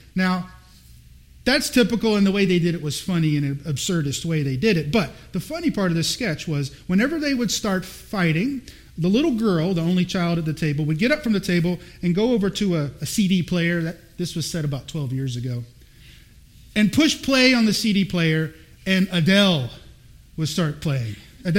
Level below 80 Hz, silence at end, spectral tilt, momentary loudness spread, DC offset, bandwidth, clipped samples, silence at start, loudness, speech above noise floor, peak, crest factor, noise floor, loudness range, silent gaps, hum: -48 dBFS; 0 s; -5 dB/octave; 11 LU; under 0.1%; 16.5 kHz; under 0.1%; 0.15 s; -22 LUFS; 27 dB; -2 dBFS; 20 dB; -48 dBFS; 4 LU; none; none